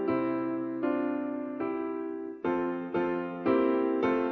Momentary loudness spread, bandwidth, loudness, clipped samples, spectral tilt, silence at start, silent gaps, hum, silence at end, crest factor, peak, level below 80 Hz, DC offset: 8 LU; 4.8 kHz; -31 LUFS; under 0.1%; -8.5 dB/octave; 0 s; none; none; 0 s; 16 dB; -14 dBFS; -66 dBFS; under 0.1%